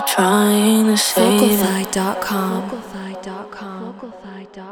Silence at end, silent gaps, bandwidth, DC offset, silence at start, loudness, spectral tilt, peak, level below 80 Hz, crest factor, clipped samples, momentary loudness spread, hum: 0 s; none; over 20 kHz; under 0.1%; 0 s; -16 LUFS; -4 dB/octave; -2 dBFS; -54 dBFS; 16 dB; under 0.1%; 20 LU; none